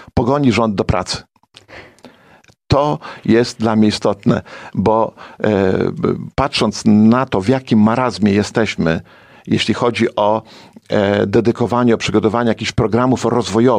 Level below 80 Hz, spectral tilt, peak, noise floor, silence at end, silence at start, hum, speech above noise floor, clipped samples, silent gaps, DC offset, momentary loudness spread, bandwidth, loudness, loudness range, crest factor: -40 dBFS; -6 dB/octave; -2 dBFS; -49 dBFS; 0 s; 0 s; none; 34 dB; under 0.1%; none; under 0.1%; 6 LU; 10.5 kHz; -16 LUFS; 4 LU; 14 dB